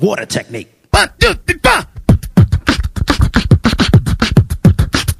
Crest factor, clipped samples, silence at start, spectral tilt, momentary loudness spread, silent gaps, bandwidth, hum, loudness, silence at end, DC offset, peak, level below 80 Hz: 12 dB; 0.5%; 0 s; -5.5 dB/octave; 7 LU; none; 15 kHz; none; -13 LUFS; 0.05 s; under 0.1%; 0 dBFS; -20 dBFS